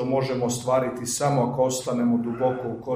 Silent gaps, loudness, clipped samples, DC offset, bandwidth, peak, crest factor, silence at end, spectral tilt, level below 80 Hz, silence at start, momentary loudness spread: none; -24 LUFS; under 0.1%; under 0.1%; 15.5 kHz; -8 dBFS; 16 dB; 0 s; -5.5 dB/octave; -58 dBFS; 0 s; 3 LU